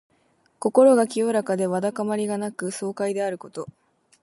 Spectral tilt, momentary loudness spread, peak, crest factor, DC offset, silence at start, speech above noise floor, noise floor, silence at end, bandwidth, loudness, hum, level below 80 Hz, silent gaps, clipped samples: -5.5 dB/octave; 16 LU; -4 dBFS; 20 dB; under 0.1%; 0.6 s; 42 dB; -64 dBFS; 0.55 s; 11.5 kHz; -23 LUFS; none; -74 dBFS; none; under 0.1%